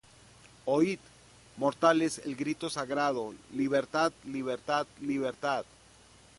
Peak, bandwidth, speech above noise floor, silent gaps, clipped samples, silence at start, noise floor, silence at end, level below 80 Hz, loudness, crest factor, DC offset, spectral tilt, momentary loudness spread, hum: -10 dBFS; 11.5 kHz; 27 dB; none; under 0.1%; 0.65 s; -58 dBFS; 0.75 s; -68 dBFS; -31 LUFS; 22 dB; under 0.1%; -5 dB/octave; 10 LU; none